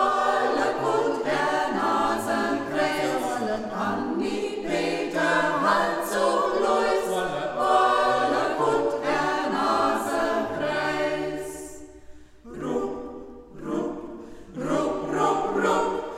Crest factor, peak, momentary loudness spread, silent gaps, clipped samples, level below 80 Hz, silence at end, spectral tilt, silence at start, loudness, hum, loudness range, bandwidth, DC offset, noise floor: 18 dB; -6 dBFS; 12 LU; none; under 0.1%; -54 dBFS; 0 s; -4.5 dB/octave; 0 s; -25 LUFS; none; 8 LU; 16 kHz; under 0.1%; -45 dBFS